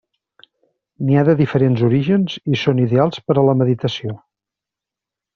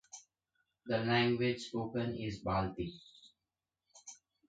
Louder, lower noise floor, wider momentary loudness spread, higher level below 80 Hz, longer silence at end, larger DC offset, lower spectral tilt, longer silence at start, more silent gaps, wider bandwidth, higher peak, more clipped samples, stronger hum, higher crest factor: first, -17 LUFS vs -36 LUFS; second, -86 dBFS vs under -90 dBFS; second, 9 LU vs 23 LU; first, -54 dBFS vs -60 dBFS; first, 1.2 s vs 0.35 s; neither; first, -7 dB/octave vs -5.5 dB/octave; first, 1 s vs 0.15 s; neither; second, 6.8 kHz vs 9 kHz; first, 0 dBFS vs -18 dBFS; neither; neither; about the same, 16 dB vs 20 dB